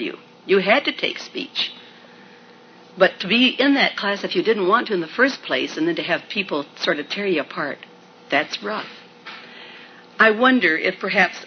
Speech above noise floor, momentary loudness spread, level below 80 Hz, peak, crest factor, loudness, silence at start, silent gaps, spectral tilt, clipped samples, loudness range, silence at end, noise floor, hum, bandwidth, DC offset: 27 dB; 21 LU; -76 dBFS; -2 dBFS; 20 dB; -20 LUFS; 0 s; none; -4.5 dB/octave; under 0.1%; 6 LU; 0 s; -47 dBFS; none; 6.6 kHz; under 0.1%